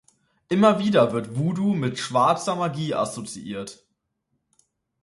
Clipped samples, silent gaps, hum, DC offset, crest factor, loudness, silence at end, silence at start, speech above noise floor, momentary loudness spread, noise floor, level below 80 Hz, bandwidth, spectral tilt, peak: under 0.1%; none; none; under 0.1%; 18 dB; -23 LUFS; 1.3 s; 0.5 s; 53 dB; 15 LU; -76 dBFS; -64 dBFS; 11.5 kHz; -6 dB/octave; -6 dBFS